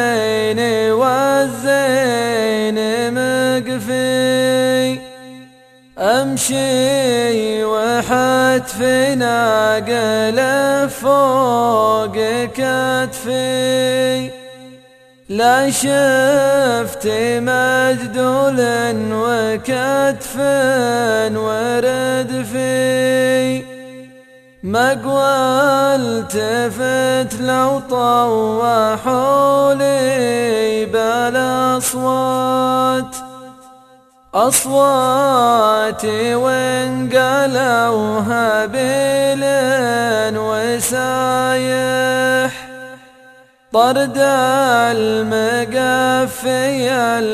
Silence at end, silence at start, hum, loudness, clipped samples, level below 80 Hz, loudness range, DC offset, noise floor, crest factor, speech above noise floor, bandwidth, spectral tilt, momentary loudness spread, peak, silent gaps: 0 s; 0 s; none; -15 LUFS; under 0.1%; -52 dBFS; 3 LU; under 0.1%; -48 dBFS; 16 dB; 33 dB; 15 kHz; -4 dB/octave; 5 LU; 0 dBFS; none